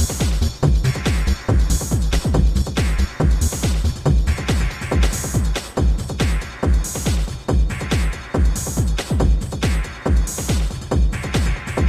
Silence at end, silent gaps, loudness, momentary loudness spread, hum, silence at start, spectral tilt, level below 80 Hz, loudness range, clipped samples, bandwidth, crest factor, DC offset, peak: 0 s; none; -20 LUFS; 3 LU; none; 0 s; -5 dB/octave; -20 dBFS; 2 LU; under 0.1%; 15.5 kHz; 14 dB; under 0.1%; -4 dBFS